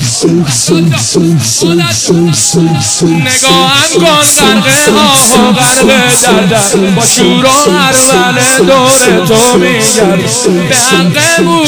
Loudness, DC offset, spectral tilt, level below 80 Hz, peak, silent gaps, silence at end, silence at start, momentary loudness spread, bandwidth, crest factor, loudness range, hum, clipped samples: -5 LUFS; under 0.1%; -3 dB/octave; -38 dBFS; 0 dBFS; none; 0 s; 0 s; 4 LU; over 20 kHz; 6 dB; 2 LU; none; 1%